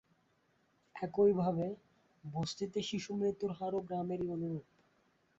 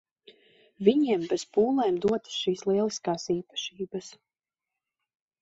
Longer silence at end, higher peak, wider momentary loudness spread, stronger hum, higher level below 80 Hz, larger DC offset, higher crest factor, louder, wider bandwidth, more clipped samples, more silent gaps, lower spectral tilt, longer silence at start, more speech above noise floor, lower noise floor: second, 0.8 s vs 1.3 s; second, -20 dBFS vs -8 dBFS; about the same, 14 LU vs 12 LU; neither; about the same, -70 dBFS vs -68 dBFS; neither; about the same, 18 dB vs 22 dB; second, -37 LUFS vs -27 LUFS; about the same, 7.6 kHz vs 8 kHz; neither; neither; first, -6.5 dB/octave vs -5 dB/octave; first, 0.95 s vs 0.8 s; second, 39 dB vs 63 dB; second, -75 dBFS vs -90 dBFS